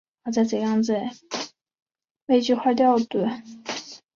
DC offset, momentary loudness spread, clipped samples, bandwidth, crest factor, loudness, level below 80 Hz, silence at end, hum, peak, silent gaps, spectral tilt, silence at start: under 0.1%; 14 LU; under 0.1%; 7.4 kHz; 16 dB; -24 LUFS; -68 dBFS; 0.2 s; none; -8 dBFS; 1.82-1.86 s, 2.11-2.15 s, 2.22-2.27 s; -5 dB/octave; 0.25 s